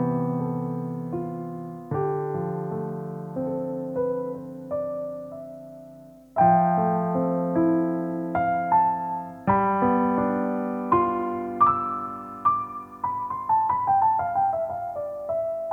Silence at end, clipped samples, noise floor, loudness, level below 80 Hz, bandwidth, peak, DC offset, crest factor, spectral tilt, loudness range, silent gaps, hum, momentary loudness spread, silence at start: 0 s; under 0.1%; -47 dBFS; -25 LUFS; -58 dBFS; 3.8 kHz; -8 dBFS; under 0.1%; 18 dB; -10.5 dB/octave; 7 LU; none; none; 12 LU; 0 s